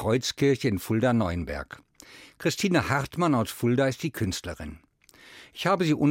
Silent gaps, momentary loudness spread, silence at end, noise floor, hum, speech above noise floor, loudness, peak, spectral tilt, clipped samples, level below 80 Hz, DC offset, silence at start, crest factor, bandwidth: none; 14 LU; 0 s; -53 dBFS; none; 27 dB; -26 LUFS; -10 dBFS; -5.5 dB/octave; under 0.1%; -52 dBFS; under 0.1%; 0 s; 16 dB; 17 kHz